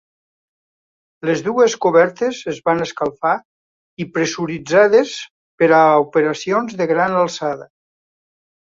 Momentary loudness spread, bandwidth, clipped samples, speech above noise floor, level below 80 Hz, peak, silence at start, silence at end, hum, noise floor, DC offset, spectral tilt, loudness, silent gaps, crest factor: 13 LU; 7.6 kHz; under 0.1%; over 74 dB; -62 dBFS; -2 dBFS; 1.25 s; 1 s; none; under -90 dBFS; under 0.1%; -5 dB/octave; -17 LUFS; 3.45-3.97 s, 5.31-5.58 s; 16 dB